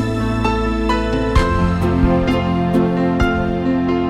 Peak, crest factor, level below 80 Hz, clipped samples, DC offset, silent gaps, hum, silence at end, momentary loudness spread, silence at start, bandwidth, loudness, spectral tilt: -2 dBFS; 14 dB; -24 dBFS; under 0.1%; under 0.1%; none; none; 0 s; 3 LU; 0 s; 12 kHz; -17 LUFS; -7.5 dB/octave